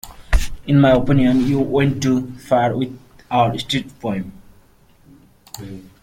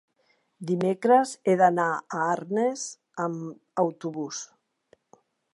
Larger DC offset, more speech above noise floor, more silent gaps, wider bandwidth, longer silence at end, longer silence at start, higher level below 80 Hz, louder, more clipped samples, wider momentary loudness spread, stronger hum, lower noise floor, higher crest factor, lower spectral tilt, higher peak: neither; second, 34 dB vs 44 dB; neither; first, 16 kHz vs 11.5 kHz; second, 0.2 s vs 1.1 s; second, 0.05 s vs 0.6 s; first, -30 dBFS vs -80 dBFS; first, -18 LUFS vs -26 LUFS; neither; first, 20 LU vs 15 LU; neither; second, -51 dBFS vs -69 dBFS; about the same, 16 dB vs 20 dB; about the same, -6.5 dB/octave vs -5.5 dB/octave; first, -2 dBFS vs -8 dBFS